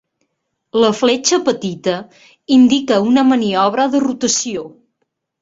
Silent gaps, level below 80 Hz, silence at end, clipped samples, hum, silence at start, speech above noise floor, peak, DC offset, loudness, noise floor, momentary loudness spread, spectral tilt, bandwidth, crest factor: none; -58 dBFS; 0.7 s; under 0.1%; none; 0.75 s; 57 dB; -2 dBFS; under 0.1%; -15 LUFS; -72 dBFS; 10 LU; -3.5 dB/octave; 8 kHz; 14 dB